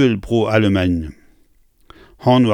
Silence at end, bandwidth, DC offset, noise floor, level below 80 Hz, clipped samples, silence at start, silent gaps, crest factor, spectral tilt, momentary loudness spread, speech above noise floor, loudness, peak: 0 s; 10.5 kHz; under 0.1%; -54 dBFS; -40 dBFS; under 0.1%; 0 s; none; 16 dB; -7.5 dB/octave; 8 LU; 39 dB; -17 LUFS; -2 dBFS